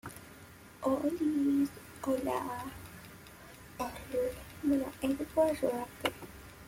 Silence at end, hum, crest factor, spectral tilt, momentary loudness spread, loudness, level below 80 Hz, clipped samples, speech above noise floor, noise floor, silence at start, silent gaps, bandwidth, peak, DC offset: 0 s; none; 20 dB; -5.5 dB/octave; 20 LU; -34 LUFS; -58 dBFS; under 0.1%; 21 dB; -53 dBFS; 0.05 s; none; 16.5 kHz; -14 dBFS; under 0.1%